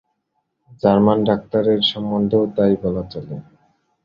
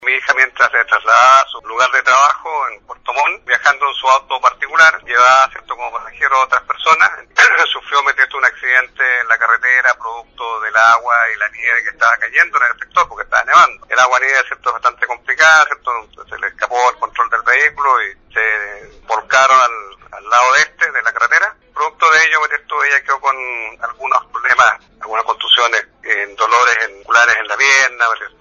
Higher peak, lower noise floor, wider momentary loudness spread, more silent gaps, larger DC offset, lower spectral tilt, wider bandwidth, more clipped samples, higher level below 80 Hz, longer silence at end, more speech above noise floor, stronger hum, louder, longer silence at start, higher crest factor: about the same, -2 dBFS vs 0 dBFS; first, -72 dBFS vs -33 dBFS; first, 15 LU vs 11 LU; neither; neither; first, -8.5 dB/octave vs 1 dB/octave; second, 5.6 kHz vs 10 kHz; neither; about the same, -50 dBFS vs -54 dBFS; first, 0.6 s vs 0.1 s; first, 55 dB vs 19 dB; neither; second, -18 LUFS vs -12 LUFS; first, 0.85 s vs 0 s; about the same, 18 dB vs 14 dB